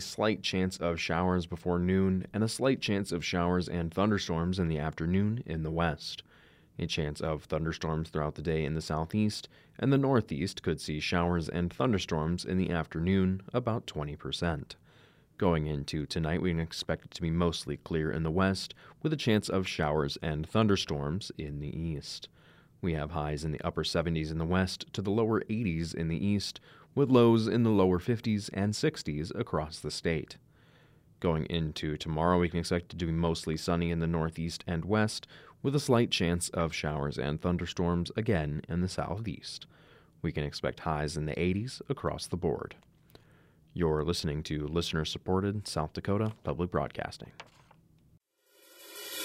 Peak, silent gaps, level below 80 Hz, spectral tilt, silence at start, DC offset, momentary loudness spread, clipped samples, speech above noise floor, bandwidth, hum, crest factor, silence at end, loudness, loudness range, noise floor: -12 dBFS; none; -52 dBFS; -6 dB/octave; 0 s; under 0.1%; 9 LU; under 0.1%; 36 dB; 15 kHz; none; 20 dB; 0 s; -31 LUFS; 6 LU; -66 dBFS